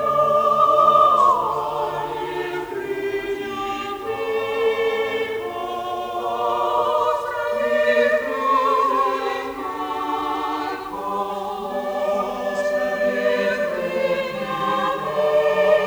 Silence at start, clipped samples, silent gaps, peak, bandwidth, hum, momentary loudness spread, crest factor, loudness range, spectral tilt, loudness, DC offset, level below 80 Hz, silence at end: 0 s; under 0.1%; none; -4 dBFS; over 20 kHz; none; 10 LU; 18 dB; 5 LU; -4.5 dB/octave; -21 LUFS; under 0.1%; -56 dBFS; 0 s